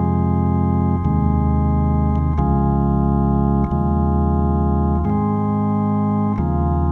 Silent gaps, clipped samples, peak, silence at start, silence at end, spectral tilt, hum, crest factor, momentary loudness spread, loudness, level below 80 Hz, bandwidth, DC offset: none; under 0.1%; -6 dBFS; 0 s; 0 s; -12.5 dB/octave; none; 12 dB; 2 LU; -18 LUFS; -24 dBFS; 3.3 kHz; under 0.1%